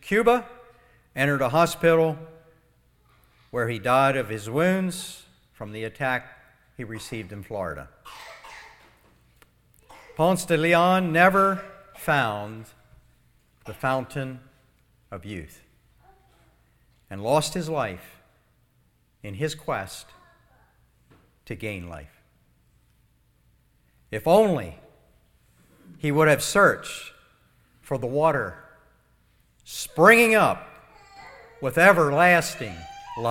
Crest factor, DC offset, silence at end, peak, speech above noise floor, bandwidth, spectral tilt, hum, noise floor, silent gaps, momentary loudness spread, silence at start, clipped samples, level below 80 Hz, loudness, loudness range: 24 dB; under 0.1%; 0 s; -2 dBFS; 42 dB; 17.5 kHz; -5 dB/octave; 60 Hz at -60 dBFS; -64 dBFS; none; 24 LU; 0.05 s; under 0.1%; -56 dBFS; -22 LUFS; 16 LU